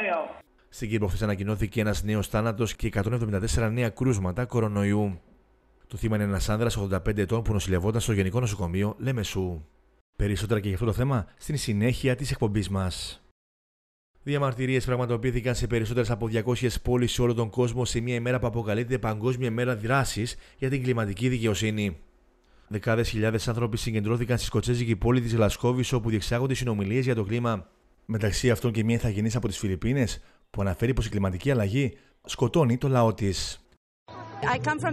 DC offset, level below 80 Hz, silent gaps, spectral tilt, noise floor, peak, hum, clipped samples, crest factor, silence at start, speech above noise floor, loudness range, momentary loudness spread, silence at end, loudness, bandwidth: under 0.1%; -42 dBFS; 10.01-10.13 s, 13.31-14.14 s, 33.77-34.06 s; -6 dB/octave; -61 dBFS; -10 dBFS; none; under 0.1%; 16 dB; 0 s; 35 dB; 3 LU; 7 LU; 0 s; -27 LUFS; 14.5 kHz